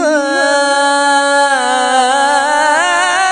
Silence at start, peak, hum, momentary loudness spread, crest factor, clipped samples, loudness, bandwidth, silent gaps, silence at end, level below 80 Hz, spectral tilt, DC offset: 0 s; 0 dBFS; none; 2 LU; 12 dB; under 0.1%; -11 LUFS; 10.5 kHz; none; 0 s; -58 dBFS; 0.5 dB/octave; under 0.1%